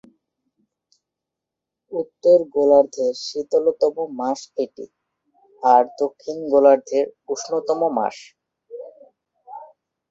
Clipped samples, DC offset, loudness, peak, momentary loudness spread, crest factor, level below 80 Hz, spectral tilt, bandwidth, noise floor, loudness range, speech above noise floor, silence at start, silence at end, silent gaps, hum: under 0.1%; under 0.1%; -20 LUFS; -2 dBFS; 24 LU; 20 dB; -68 dBFS; -4.5 dB/octave; 7.8 kHz; -85 dBFS; 2 LU; 66 dB; 1.9 s; 0.45 s; none; none